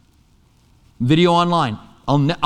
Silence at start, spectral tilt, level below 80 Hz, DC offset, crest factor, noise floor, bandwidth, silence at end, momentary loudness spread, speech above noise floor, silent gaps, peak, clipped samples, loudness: 1 s; -7 dB/octave; -46 dBFS; under 0.1%; 18 dB; -54 dBFS; 10 kHz; 0 s; 11 LU; 39 dB; none; -2 dBFS; under 0.1%; -17 LUFS